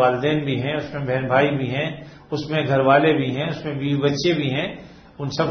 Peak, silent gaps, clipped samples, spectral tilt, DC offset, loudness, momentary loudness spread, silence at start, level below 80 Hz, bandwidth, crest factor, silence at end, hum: -2 dBFS; none; under 0.1%; -6.5 dB/octave; under 0.1%; -21 LUFS; 13 LU; 0 s; -54 dBFS; 6.6 kHz; 18 dB; 0 s; none